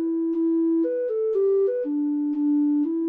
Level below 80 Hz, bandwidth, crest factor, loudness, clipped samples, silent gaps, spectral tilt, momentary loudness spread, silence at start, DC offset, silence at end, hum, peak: -76 dBFS; 2.5 kHz; 6 dB; -23 LUFS; under 0.1%; none; -9.5 dB/octave; 3 LU; 0 s; under 0.1%; 0 s; none; -16 dBFS